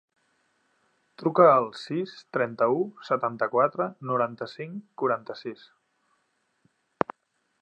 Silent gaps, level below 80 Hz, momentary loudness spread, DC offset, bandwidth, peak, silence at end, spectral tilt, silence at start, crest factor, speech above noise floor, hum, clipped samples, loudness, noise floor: none; -78 dBFS; 18 LU; under 0.1%; 8.6 kHz; -4 dBFS; 2.1 s; -7.5 dB/octave; 1.2 s; 24 dB; 49 dB; none; under 0.1%; -26 LUFS; -74 dBFS